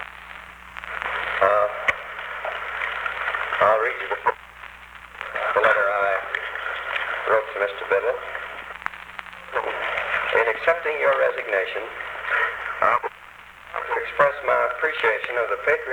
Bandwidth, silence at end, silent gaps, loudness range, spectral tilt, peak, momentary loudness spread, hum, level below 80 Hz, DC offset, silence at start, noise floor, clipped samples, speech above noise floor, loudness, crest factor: over 20 kHz; 0 s; none; 3 LU; -3.5 dB/octave; -4 dBFS; 17 LU; 60 Hz at -55 dBFS; -56 dBFS; under 0.1%; 0 s; -44 dBFS; under 0.1%; 21 dB; -23 LUFS; 22 dB